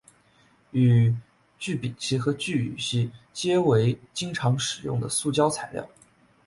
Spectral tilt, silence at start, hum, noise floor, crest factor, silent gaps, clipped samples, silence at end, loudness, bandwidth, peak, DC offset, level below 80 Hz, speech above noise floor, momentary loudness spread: -5.5 dB/octave; 0.75 s; none; -61 dBFS; 18 dB; none; under 0.1%; 0.6 s; -25 LUFS; 11.5 kHz; -8 dBFS; under 0.1%; -60 dBFS; 36 dB; 11 LU